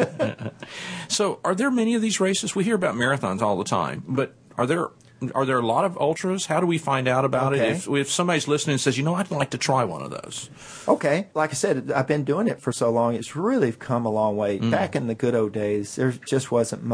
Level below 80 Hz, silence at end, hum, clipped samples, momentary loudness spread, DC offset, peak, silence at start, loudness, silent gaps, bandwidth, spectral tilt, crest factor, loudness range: -64 dBFS; 0 s; none; under 0.1%; 6 LU; under 0.1%; -4 dBFS; 0 s; -24 LUFS; none; 11 kHz; -5 dB/octave; 18 dB; 2 LU